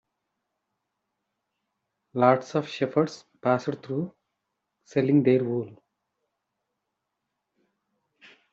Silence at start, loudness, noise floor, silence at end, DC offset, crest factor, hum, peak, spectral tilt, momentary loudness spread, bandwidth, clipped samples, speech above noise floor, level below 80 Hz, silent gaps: 2.15 s; -25 LUFS; -82 dBFS; 2.8 s; under 0.1%; 22 dB; none; -6 dBFS; -6.5 dB/octave; 11 LU; 7.8 kHz; under 0.1%; 58 dB; -74 dBFS; none